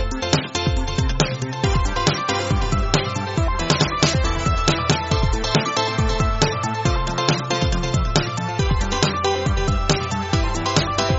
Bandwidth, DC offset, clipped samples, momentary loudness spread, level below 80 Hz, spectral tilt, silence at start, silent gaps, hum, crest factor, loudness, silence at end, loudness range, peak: 8 kHz; under 0.1%; under 0.1%; 3 LU; -26 dBFS; -4 dB/octave; 0 s; none; none; 20 dB; -21 LUFS; 0 s; 1 LU; 0 dBFS